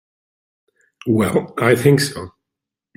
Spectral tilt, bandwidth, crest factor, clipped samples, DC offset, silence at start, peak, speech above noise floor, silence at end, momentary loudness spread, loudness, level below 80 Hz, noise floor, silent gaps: -6 dB/octave; 16.5 kHz; 20 dB; under 0.1%; under 0.1%; 1.05 s; 0 dBFS; 68 dB; 0.7 s; 18 LU; -17 LUFS; -54 dBFS; -84 dBFS; none